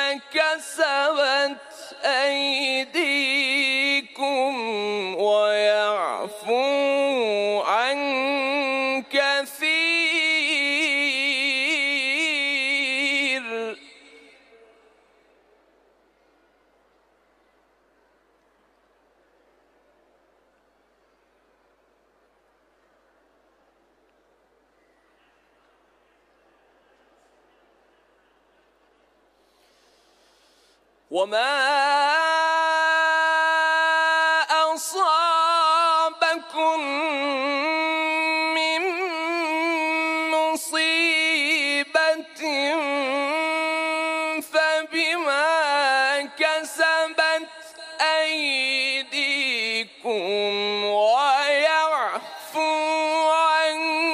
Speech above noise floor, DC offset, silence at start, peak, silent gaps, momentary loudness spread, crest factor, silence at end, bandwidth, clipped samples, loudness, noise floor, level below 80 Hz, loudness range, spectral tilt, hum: 41 dB; under 0.1%; 0 s; -8 dBFS; none; 6 LU; 16 dB; 0 s; 15.5 kHz; under 0.1%; -21 LUFS; -63 dBFS; -78 dBFS; 3 LU; -1 dB/octave; none